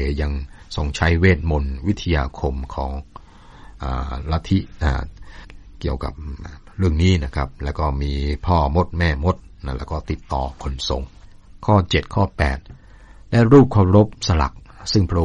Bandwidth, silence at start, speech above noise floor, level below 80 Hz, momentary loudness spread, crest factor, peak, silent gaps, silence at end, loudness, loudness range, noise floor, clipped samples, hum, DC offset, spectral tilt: 9.2 kHz; 0 s; 24 dB; -28 dBFS; 15 LU; 18 dB; -2 dBFS; none; 0 s; -20 LUFS; 9 LU; -43 dBFS; under 0.1%; none; under 0.1%; -7 dB/octave